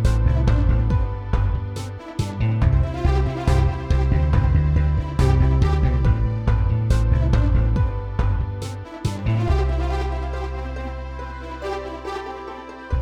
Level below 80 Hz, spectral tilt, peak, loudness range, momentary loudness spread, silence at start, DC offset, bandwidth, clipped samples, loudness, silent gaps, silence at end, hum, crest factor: -22 dBFS; -7.5 dB/octave; -6 dBFS; 6 LU; 12 LU; 0 s; under 0.1%; 10 kHz; under 0.1%; -22 LUFS; none; 0 s; none; 14 dB